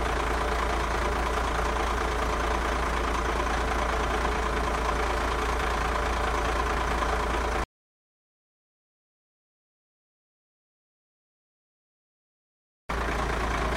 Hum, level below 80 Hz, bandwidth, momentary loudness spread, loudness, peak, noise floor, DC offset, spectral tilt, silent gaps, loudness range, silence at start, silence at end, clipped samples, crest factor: none; -34 dBFS; 15.5 kHz; 1 LU; -28 LUFS; -12 dBFS; under -90 dBFS; under 0.1%; -4.5 dB/octave; 7.65-12.89 s; 9 LU; 0 s; 0 s; under 0.1%; 16 dB